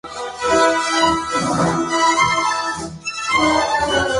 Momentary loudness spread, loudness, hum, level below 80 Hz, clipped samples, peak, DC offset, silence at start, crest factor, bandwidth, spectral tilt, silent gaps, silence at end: 9 LU; -17 LUFS; none; -44 dBFS; under 0.1%; -2 dBFS; under 0.1%; 0.05 s; 16 dB; 11.5 kHz; -3 dB/octave; none; 0 s